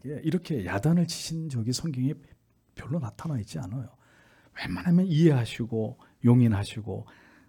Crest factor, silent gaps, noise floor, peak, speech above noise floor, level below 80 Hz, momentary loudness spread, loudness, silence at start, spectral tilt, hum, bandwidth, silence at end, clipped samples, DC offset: 18 dB; none; -59 dBFS; -8 dBFS; 32 dB; -60 dBFS; 16 LU; -27 LUFS; 0.05 s; -7 dB/octave; none; 16.5 kHz; 0.45 s; under 0.1%; under 0.1%